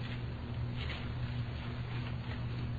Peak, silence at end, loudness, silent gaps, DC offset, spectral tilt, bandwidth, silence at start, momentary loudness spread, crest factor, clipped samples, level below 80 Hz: -26 dBFS; 0 s; -40 LUFS; none; under 0.1%; -8 dB/octave; 7 kHz; 0 s; 2 LU; 12 dB; under 0.1%; -46 dBFS